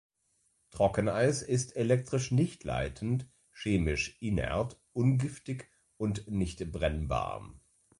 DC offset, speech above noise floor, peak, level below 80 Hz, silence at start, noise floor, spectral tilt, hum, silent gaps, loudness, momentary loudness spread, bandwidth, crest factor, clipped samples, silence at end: under 0.1%; 44 dB; -14 dBFS; -46 dBFS; 0.75 s; -74 dBFS; -6 dB/octave; none; none; -32 LUFS; 10 LU; 11.5 kHz; 18 dB; under 0.1%; 0.4 s